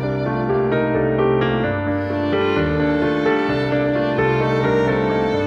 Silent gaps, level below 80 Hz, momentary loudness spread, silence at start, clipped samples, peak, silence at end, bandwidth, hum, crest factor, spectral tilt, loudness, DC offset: none; -40 dBFS; 3 LU; 0 s; under 0.1%; -6 dBFS; 0 s; 7.4 kHz; none; 12 dB; -8 dB/octave; -19 LUFS; under 0.1%